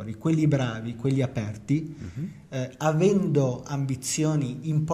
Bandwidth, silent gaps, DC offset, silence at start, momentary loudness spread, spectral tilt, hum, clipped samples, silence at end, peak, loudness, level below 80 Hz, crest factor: 14.5 kHz; none; under 0.1%; 0 s; 12 LU; -6.5 dB/octave; none; under 0.1%; 0 s; -8 dBFS; -26 LUFS; -56 dBFS; 16 dB